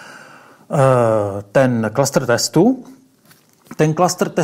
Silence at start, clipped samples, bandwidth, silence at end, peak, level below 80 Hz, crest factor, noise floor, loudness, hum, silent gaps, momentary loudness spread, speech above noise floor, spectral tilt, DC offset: 0 s; under 0.1%; 16 kHz; 0 s; -2 dBFS; -56 dBFS; 16 dB; -52 dBFS; -16 LUFS; none; none; 6 LU; 36 dB; -5.5 dB/octave; under 0.1%